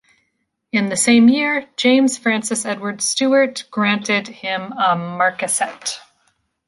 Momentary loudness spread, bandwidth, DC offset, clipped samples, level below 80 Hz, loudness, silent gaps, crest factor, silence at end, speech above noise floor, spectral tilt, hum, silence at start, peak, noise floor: 11 LU; 12 kHz; under 0.1%; under 0.1%; -66 dBFS; -17 LUFS; none; 16 dB; 0.7 s; 53 dB; -3 dB/octave; none; 0.75 s; -2 dBFS; -71 dBFS